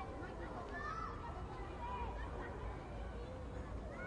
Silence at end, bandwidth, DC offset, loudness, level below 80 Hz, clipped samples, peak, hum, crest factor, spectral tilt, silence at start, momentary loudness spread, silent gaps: 0 s; 10.5 kHz; under 0.1%; -47 LUFS; -50 dBFS; under 0.1%; -32 dBFS; none; 14 dB; -7 dB/octave; 0 s; 4 LU; none